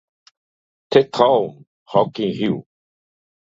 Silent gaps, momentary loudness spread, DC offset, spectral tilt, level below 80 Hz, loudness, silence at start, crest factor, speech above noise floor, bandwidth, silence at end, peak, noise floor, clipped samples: 1.67-1.86 s; 9 LU; under 0.1%; -6.5 dB/octave; -62 dBFS; -19 LUFS; 0.9 s; 20 dB; over 72 dB; 7.6 kHz; 0.85 s; 0 dBFS; under -90 dBFS; under 0.1%